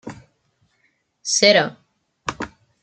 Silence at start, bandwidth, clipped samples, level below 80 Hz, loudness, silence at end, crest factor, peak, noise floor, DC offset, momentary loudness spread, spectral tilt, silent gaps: 0.05 s; 9.4 kHz; under 0.1%; -58 dBFS; -18 LUFS; 0.35 s; 22 dB; 0 dBFS; -67 dBFS; under 0.1%; 20 LU; -2 dB/octave; none